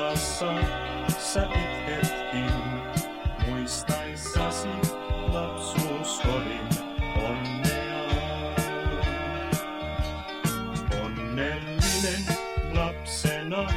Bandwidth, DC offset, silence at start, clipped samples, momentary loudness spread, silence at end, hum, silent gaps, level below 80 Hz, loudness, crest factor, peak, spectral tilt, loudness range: 16 kHz; 0.1%; 0 s; under 0.1%; 4 LU; 0 s; none; none; -34 dBFS; -29 LUFS; 18 dB; -10 dBFS; -4.5 dB/octave; 1 LU